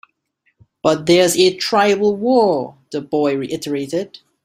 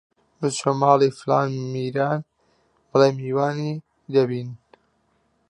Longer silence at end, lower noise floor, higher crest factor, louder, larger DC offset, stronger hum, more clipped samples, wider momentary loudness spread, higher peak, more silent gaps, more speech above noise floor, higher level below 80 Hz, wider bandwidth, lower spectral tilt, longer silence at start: second, 0.4 s vs 0.95 s; about the same, -66 dBFS vs -67 dBFS; second, 16 dB vs 22 dB; first, -17 LUFS vs -22 LUFS; neither; neither; neither; about the same, 11 LU vs 11 LU; about the same, -2 dBFS vs -2 dBFS; neither; first, 50 dB vs 46 dB; first, -58 dBFS vs -70 dBFS; first, 16 kHz vs 11 kHz; second, -4 dB/octave vs -6 dB/octave; first, 0.85 s vs 0.4 s